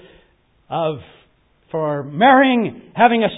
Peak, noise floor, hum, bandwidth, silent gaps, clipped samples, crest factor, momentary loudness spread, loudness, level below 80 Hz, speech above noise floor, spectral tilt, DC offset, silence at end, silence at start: 0 dBFS; -57 dBFS; none; 4 kHz; none; under 0.1%; 18 dB; 16 LU; -17 LUFS; -58 dBFS; 41 dB; -10.5 dB/octave; under 0.1%; 0 s; 0.7 s